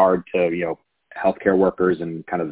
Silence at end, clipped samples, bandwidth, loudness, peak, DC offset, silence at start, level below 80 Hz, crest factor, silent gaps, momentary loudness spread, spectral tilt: 0 s; under 0.1%; 4 kHz; -21 LUFS; -2 dBFS; under 0.1%; 0 s; -52 dBFS; 18 dB; none; 10 LU; -11 dB/octave